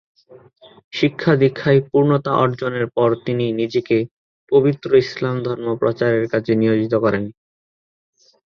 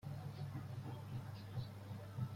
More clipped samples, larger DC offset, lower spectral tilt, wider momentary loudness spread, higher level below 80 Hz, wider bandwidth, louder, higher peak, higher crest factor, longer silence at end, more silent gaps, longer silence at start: neither; neither; about the same, -8 dB/octave vs -7.5 dB/octave; first, 7 LU vs 2 LU; first, -56 dBFS vs -68 dBFS; second, 6.6 kHz vs 16.5 kHz; first, -18 LUFS vs -49 LUFS; first, -2 dBFS vs -32 dBFS; about the same, 16 dB vs 16 dB; first, 1.25 s vs 0 s; first, 0.84-0.91 s, 4.11-4.47 s vs none; first, 0.3 s vs 0.05 s